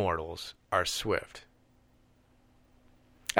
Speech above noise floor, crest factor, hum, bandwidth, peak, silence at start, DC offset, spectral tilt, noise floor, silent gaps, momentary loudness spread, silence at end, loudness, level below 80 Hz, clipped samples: 32 dB; 32 dB; none; over 20 kHz; -4 dBFS; 0 s; under 0.1%; -3 dB/octave; -65 dBFS; none; 17 LU; 0 s; -33 LUFS; -56 dBFS; under 0.1%